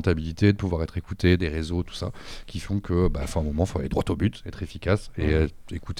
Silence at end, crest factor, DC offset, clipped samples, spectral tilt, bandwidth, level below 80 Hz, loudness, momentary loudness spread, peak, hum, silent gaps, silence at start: 0 s; 18 dB; under 0.1%; under 0.1%; -7 dB/octave; 13 kHz; -34 dBFS; -26 LUFS; 13 LU; -8 dBFS; none; none; 0 s